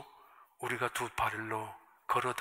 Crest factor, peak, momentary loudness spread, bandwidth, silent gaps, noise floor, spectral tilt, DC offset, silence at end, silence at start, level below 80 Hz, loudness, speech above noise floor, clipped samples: 20 dB; -16 dBFS; 14 LU; 16 kHz; none; -60 dBFS; -3.5 dB/octave; under 0.1%; 0 s; 0 s; -64 dBFS; -35 LUFS; 25 dB; under 0.1%